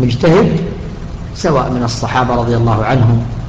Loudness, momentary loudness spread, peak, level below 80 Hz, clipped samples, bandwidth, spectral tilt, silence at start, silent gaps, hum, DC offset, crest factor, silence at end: -13 LUFS; 15 LU; -2 dBFS; -28 dBFS; under 0.1%; 8 kHz; -7 dB/octave; 0 s; none; none; under 0.1%; 10 dB; 0 s